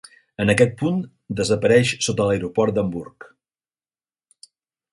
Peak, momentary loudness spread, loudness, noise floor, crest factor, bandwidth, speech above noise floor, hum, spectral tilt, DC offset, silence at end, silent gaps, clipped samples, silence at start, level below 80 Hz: -2 dBFS; 14 LU; -20 LUFS; under -90 dBFS; 20 dB; 11.5 kHz; over 70 dB; none; -5 dB/octave; under 0.1%; 1.85 s; none; under 0.1%; 0.4 s; -50 dBFS